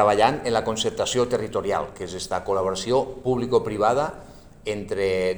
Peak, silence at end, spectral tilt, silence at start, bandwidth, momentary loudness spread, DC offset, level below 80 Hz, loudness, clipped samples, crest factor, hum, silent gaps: -4 dBFS; 0 s; -4.5 dB/octave; 0 s; over 20 kHz; 10 LU; under 0.1%; -48 dBFS; -24 LUFS; under 0.1%; 20 dB; none; none